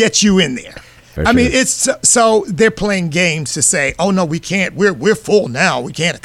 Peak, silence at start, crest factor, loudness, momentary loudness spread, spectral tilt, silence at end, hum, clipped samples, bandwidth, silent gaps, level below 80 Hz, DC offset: 0 dBFS; 0 s; 14 dB; -13 LUFS; 7 LU; -3.5 dB/octave; 0.05 s; none; under 0.1%; 15.5 kHz; none; -36 dBFS; under 0.1%